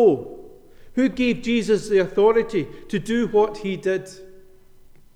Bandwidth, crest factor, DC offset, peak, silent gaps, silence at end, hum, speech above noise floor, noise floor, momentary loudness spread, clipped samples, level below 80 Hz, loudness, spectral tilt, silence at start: 12 kHz; 16 dB; under 0.1%; -6 dBFS; none; 0.75 s; none; 27 dB; -47 dBFS; 11 LU; under 0.1%; -48 dBFS; -21 LUFS; -6 dB/octave; 0 s